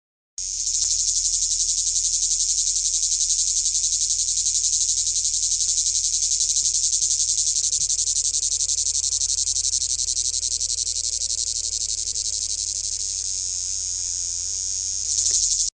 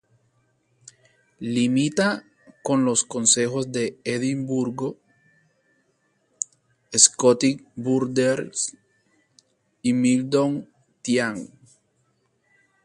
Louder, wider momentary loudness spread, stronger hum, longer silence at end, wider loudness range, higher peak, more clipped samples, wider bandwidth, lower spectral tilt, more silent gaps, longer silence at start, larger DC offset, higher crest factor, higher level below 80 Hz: about the same, -20 LUFS vs -22 LUFS; second, 5 LU vs 14 LU; neither; second, 0.05 s vs 1.4 s; about the same, 4 LU vs 4 LU; second, -6 dBFS vs 0 dBFS; neither; about the same, 11 kHz vs 11.5 kHz; second, 3 dB/octave vs -3.5 dB/octave; neither; second, 0.4 s vs 1.4 s; neither; second, 16 dB vs 24 dB; first, -46 dBFS vs -68 dBFS